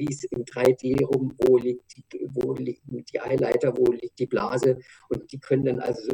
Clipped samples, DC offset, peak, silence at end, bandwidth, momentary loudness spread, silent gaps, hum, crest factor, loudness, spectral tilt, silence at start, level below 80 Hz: under 0.1%; under 0.1%; -6 dBFS; 0 s; 14 kHz; 12 LU; none; none; 20 dB; -25 LUFS; -7 dB/octave; 0 s; -56 dBFS